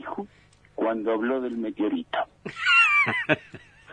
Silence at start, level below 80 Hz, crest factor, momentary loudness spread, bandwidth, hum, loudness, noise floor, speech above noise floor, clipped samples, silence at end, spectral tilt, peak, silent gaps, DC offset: 0 s; -64 dBFS; 22 dB; 19 LU; 10 kHz; 50 Hz at -60 dBFS; -23 LUFS; -57 dBFS; 30 dB; under 0.1%; 0 s; -4.5 dB/octave; -4 dBFS; none; under 0.1%